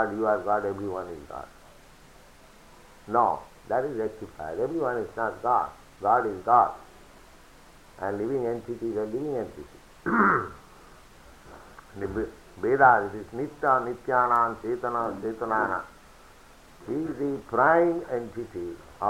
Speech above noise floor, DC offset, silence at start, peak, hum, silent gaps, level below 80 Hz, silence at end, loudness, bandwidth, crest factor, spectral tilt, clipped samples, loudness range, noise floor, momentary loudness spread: 26 dB; under 0.1%; 0 s; -6 dBFS; none; none; -56 dBFS; 0 s; -27 LUFS; 16 kHz; 22 dB; -7 dB/octave; under 0.1%; 7 LU; -52 dBFS; 17 LU